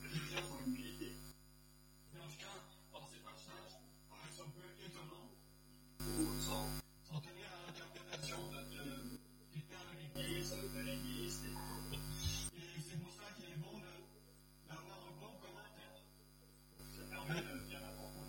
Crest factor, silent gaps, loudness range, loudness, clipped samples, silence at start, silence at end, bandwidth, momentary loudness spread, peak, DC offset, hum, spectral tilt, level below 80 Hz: 24 dB; none; 10 LU; -48 LUFS; under 0.1%; 0 s; 0 s; 17.5 kHz; 19 LU; -26 dBFS; under 0.1%; 50 Hz at -55 dBFS; -4 dB/octave; -60 dBFS